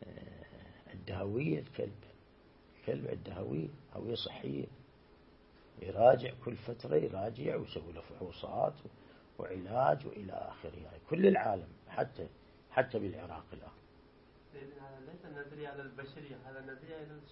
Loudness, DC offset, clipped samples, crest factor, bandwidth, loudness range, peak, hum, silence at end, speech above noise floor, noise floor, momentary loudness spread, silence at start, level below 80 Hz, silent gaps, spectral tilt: -36 LUFS; under 0.1%; under 0.1%; 26 dB; 5.6 kHz; 11 LU; -12 dBFS; none; 0 s; 26 dB; -62 dBFS; 21 LU; 0 s; -64 dBFS; none; -5.5 dB/octave